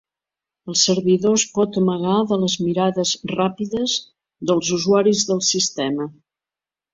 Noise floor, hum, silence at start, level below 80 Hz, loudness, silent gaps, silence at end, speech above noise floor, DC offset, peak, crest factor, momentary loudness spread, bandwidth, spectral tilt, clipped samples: -90 dBFS; none; 0.65 s; -60 dBFS; -19 LUFS; none; 0.8 s; 71 dB; under 0.1%; -4 dBFS; 16 dB; 8 LU; 7.8 kHz; -4 dB/octave; under 0.1%